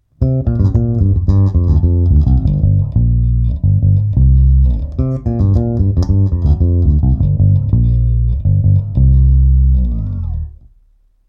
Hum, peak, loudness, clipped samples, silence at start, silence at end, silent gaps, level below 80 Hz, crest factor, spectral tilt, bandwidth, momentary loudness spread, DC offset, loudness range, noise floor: none; -2 dBFS; -13 LUFS; under 0.1%; 0.2 s; 0.8 s; none; -16 dBFS; 10 dB; -12 dB/octave; 5.2 kHz; 6 LU; under 0.1%; 1 LU; -51 dBFS